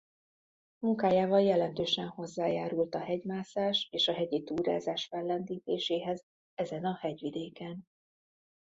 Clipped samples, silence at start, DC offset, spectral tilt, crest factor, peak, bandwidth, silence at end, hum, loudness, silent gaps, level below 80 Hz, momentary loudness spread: under 0.1%; 0.8 s; under 0.1%; -5.5 dB/octave; 18 dB; -14 dBFS; 7.8 kHz; 0.95 s; none; -32 LUFS; 6.23-6.57 s; -72 dBFS; 12 LU